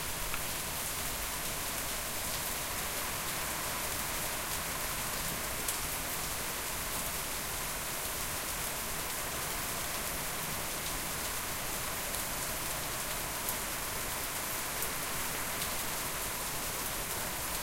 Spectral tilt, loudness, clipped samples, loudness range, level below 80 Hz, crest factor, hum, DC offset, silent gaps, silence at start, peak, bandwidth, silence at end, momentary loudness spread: -1.5 dB/octave; -34 LUFS; under 0.1%; 1 LU; -50 dBFS; 22 dB; none; under 0.1%; none; 0 s; -14 dBFS; 16.5 kHz; 0 s; 1 LU